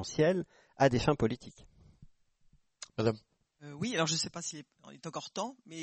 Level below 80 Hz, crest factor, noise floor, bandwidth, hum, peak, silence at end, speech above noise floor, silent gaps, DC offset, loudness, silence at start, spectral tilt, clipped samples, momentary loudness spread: -58 dBFS; 20 dB; -67 dBFS; 8.4 kHz; none; -14 dBFS; 0 s; 34 dB; none; under 0.1%; -33 LUFS; 0 s; -4.5 dB/octave; under 0.1%; 19 LU